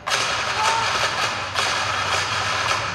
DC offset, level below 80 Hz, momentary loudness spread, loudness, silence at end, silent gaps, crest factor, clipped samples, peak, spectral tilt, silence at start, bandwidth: under 0.1%; -50 dBFS; 2 LU; -21 LUFS; 0 s; none; 16 dB; under 0.1%; -6 dBFS; -1 dB/octave; 0 s; 15.5 kHz